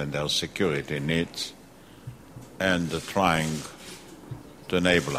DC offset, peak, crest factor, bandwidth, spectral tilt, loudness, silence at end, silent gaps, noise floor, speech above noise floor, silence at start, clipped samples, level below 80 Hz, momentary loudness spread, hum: under 0.1%; -6 dBFS; 22 dB; 16 kHz; -4.5 dB/octave; -26 LUFS; 0 s; none; -50 dBFS; 23 dB; 0 s; under 0.1%; -52 dBFS; 21 LU; none